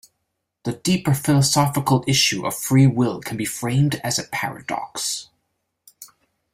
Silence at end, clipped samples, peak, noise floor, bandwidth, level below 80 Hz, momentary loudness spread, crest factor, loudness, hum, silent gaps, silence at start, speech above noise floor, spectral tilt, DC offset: 0.5 s; under 0.1%; -4 dBFS; -76 dBFS; 16 kHz; -54 dBFS; 10 LU; 18 dB; -20 LUFS; none; none; 0.65 s; 56 dB; -4.5 dB/octave; under 0.1%